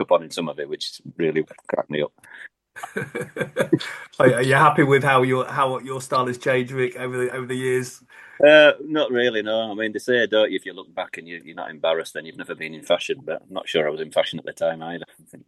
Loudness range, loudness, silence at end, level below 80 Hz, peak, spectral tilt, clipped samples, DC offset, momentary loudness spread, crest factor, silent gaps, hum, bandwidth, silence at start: 8 LU; -21 LUFS; 0.1 s; -68 dBFS; -2 dBFS; -5 dB/octave; under 0.1%; under 0.1%; 17 LU; 20 dB; none; none; 12.5 kHz; 0 s